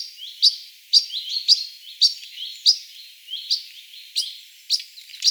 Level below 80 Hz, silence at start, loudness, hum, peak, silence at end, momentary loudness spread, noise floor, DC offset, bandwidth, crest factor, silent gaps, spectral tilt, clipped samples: under -90 dBFS; 0 s; -19 LUFS; none; -2 dBFS; 0 s; 21 LU; -43 dBFS; under 0.1%; over 20 kHz; 22 dB; none; 13.5 dB/octave; under 0.1%